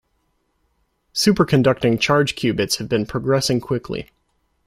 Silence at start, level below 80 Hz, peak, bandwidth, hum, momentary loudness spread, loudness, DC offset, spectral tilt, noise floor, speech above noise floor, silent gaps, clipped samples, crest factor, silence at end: 1.15 s; -48 dBFS; -2 dBFS; 16 kHz; none; 9 LU; -19 LUFS; under 0.1%; -5 dB/octave; -68 dBFS; 49 dB; none; under 0.1%; 18 dB; 0.65 s